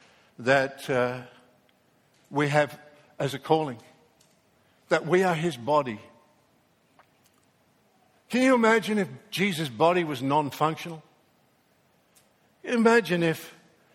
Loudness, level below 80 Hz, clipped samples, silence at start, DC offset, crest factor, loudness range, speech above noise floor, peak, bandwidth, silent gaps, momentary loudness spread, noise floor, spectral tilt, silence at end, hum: -25 LUFS; -70 dBFS; under 0.1%; 0.4 s; under 0.1%; 22 dB; 5 LU; 41 dB; -6 dBFS; 16.5 kHz; none; 15 LU; -65 dBFS; -5.5 dB/octave; 0.45 s; none